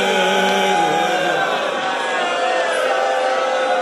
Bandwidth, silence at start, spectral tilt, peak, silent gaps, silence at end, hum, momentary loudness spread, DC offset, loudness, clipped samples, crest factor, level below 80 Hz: 13.5 kHz; 0 s; -2.5 dB/octave; -4 dBFS; none; 0 s; none; 4 LU; under 0.1%; -17 LUFS; under 0.1%; 12 dB; -68 dBFS